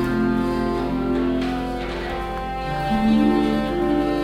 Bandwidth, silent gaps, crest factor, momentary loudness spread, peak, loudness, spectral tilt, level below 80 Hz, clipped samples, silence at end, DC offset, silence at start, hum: 15 kHz; none; 14 dB; 9 LU; -6 dBFS; -22 LUFS; -7 dB/octave; -34 dBFS; under 0.1%; 0 s; under 0.1%; 0 s; none